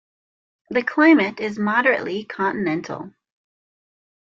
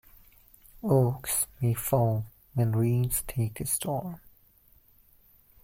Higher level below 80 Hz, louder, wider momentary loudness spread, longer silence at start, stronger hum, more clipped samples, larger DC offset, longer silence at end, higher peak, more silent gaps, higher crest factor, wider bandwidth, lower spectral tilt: second, -68 dBFS vs -52 dBFS; first, -20 LUFS vs -28 LUFS; first, 15 LU vs 10 LU; second, 0.7 s vs 0.85 s; neither; neither; neither; second, 1.25 s vs 1.45 s; first, -4 dBFS vs -12 dBFS; neither; about the same, 18 dB vs 18 dB; second, 7 kHz vs 16.5 kHz; about the same, -6.5 dB/octave vs -6 dB/octave